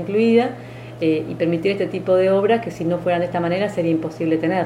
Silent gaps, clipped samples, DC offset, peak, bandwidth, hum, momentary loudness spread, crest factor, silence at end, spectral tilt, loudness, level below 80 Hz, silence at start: none; under 0.1%; under 0.1%; -4 dBFS; 11.5 kHz; none; 7 LU; 16 dB; 0 s; -7.5 dB/octave; -20 LUFS; -56 dBFS; 0 s